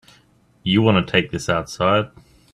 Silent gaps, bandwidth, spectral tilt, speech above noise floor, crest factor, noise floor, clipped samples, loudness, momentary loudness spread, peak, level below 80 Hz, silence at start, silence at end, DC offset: none; 12.5 kHz; -5.5 dB/octave; 38 dB; 20 dB; -56 dBFS; under 0.1%; -19 LUFS; 9 LU; 0 dBFS; -50 dBFS; 0.65 s; 0.45 s; under 0.1%